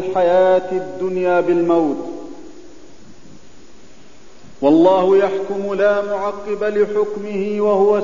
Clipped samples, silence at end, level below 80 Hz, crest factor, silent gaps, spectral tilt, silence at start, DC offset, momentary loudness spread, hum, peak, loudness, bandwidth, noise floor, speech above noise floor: under 0.1%; 0 s; -54 dBFS; 16 dB; none; -7 dB/octave; 0 s; 2%; 10 LU; none; -2 dBFS; -17 LUFS; 7.4 kHz; -46 dBFS; 30 dB